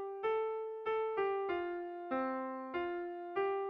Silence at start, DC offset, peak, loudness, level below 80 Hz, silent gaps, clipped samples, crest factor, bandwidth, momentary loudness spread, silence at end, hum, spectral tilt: 0 s; under 0.1%; -26 dBFS; -38 LUFS; -76 dBFS; none; under 0.1%; 12 dB; 5.4 kHz; 5 LU; 0 s; none; -2.5 dB/octave